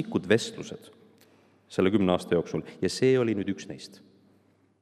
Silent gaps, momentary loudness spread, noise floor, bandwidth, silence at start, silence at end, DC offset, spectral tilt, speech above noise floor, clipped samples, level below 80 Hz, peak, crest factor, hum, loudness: none; 18 LU; -64 dBFS; 13 kHz; 0 s; 0.95 s; under 0.1%; -5.5 dB/octave; 37 dB; under 0.1%; -68 dBFS; -6 dBFS; 22 dB; none; -27 LUFS